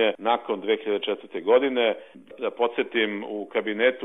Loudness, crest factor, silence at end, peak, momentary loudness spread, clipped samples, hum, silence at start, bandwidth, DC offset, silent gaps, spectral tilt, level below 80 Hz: -25 LUFS; 18 dB; 0 s; -6 dBFS; 10 LU; under 0.1%; none; 0 s; 3.9 kHz; 0.1%; none; -6.5 dB/octave; -84 dBFS